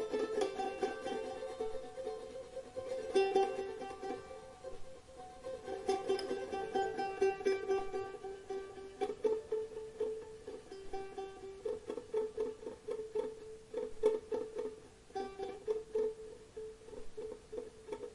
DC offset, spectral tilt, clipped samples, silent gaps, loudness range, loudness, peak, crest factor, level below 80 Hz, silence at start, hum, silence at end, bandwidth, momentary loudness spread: under 0.1%; -4.5 dB/octave; under 0.1%; none; 5 LU; -40 LUFS; -18 dBFS; 22 dB; -64 dBFS; 0 s; none; 0 s; 11.5 kHz; 15 LU